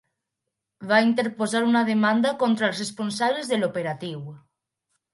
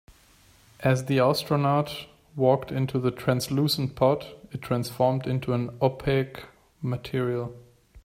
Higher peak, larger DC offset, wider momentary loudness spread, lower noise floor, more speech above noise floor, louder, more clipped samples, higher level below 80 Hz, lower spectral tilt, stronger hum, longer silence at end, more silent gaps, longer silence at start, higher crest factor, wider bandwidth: first, -4 dBFS vs -8 dBFS; neither; about the same, 13 LU vs 12 LU; first, -83 dBFS vs -57 dBFS; first, 60 dB vs 32 dB; first, -23 LUFS vs -26 LUFS; neither; second, -74 dBFS vs -54 dBFS; second, -4.5 dB/octave vs -6.5 dB/octave; neither; first, 0.75 s vs 0.05 s; neither; about the same, 0.8 s vs 0.8 s; about the same, 20 dB vs 20 dB; second, 11.5 kHz vs 16 kHz